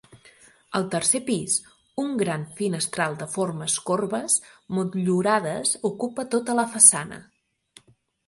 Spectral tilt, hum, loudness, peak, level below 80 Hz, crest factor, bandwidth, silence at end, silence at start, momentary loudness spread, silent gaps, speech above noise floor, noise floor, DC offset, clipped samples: -3 dB/octave; none; -23 LUFS; 0 dBFS; -66 dBFS; 26 dB; 12 kHz; 1.05 s; 0.15 s; 13 LU; none; 36 dB; -60 dBFS; under 0.1%; under 0.1%